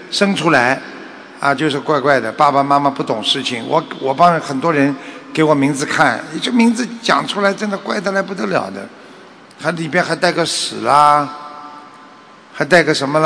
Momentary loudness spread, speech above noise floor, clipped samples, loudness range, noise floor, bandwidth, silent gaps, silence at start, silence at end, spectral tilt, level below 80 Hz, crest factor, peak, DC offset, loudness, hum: 12 LU; 26 dB; 0.3%; 4 LU; -41 dBFS; 11 kHz; none; 0 s; 0 s; -4.5 dB/octave; -60 dBFS; 16 dB; 0 dBFS; under 0.1%; -15 LUFS; none